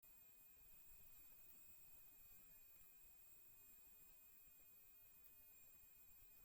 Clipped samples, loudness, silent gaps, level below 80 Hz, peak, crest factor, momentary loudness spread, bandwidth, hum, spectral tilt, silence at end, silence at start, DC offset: under 0.1%; -63 LUFS; none; -82 dBFS; -50 dBFS; 16 dB; 3 LU; 17 kHz; none; -1.5 dB/octave; 0 s; 0 s; under 0.1%